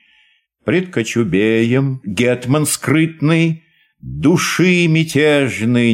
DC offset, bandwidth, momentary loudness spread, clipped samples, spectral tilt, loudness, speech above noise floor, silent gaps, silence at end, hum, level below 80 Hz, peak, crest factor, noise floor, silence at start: under 0.1%; 16 kHz; 6 LU; under 0.1%; -5.5 dB/octave; -15 LUFS; 42 dB; none; 0 s; none; -48 dBFS; -2 dBFS; 12 dB; -56 dBFS; 0.65 s